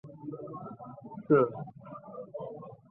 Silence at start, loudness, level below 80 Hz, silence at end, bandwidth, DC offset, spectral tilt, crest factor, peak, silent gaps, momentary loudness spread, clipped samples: 0.05 s; -31 LUFS; -74 dBFS; 0.15 s; 3.4 kHz; under 0.1%; -9.5 dB/octave; 22 dB; -12 dBFS; none; 21 LU; under 0.1%